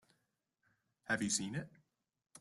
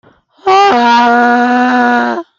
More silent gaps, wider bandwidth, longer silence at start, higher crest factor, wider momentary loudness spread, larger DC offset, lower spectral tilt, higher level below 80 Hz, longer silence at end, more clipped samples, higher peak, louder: neither; first, 12.5 kHz vs 7.4 kHz; first, 1.05 s vs 0.45 s; first, 22 dB vs 10 dB; first, 21 LU vs 4 LU; neither; about the same, -3 dB/octave vs -3.5 dB/octave; second, -74 dBFS vs -56 dBFS; second, 0 s vs 0.15 s; neither; second, -22 dBFS vs 0 dBFS; second, -38 LUFS vs -9 LUFS